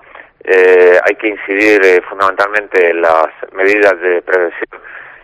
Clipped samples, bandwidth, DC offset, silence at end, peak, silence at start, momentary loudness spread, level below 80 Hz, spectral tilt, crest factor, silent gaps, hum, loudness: 0.4%; 9.8 kHz; under 0.1%; 0.15 s; 0 dBFS; 0.45 s; 13 LU; -56 dBFS; -4 dB/octave; 12 dB; none; none; -10 LUFS